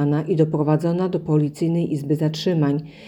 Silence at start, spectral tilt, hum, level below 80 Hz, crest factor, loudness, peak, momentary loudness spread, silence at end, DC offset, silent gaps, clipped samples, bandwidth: 0 s; -8 dB/octave; none; -60 dBFS; 16 dB; -21 LUFS; -6 dBFS; 3 LU; 0 s; under 0.1%; none; under 0.1%; 12.5 kHz